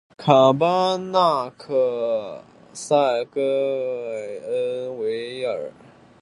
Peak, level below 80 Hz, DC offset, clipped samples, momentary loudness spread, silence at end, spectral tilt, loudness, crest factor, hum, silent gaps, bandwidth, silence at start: 0 dBFS; -68 dBFS; under 0.1%; under 0.1%; 14 LU; 0.5 s; -5.5 dB/octave; -22 LUFS; 22 dB; none; none; 11.5 kHz; 0.2 s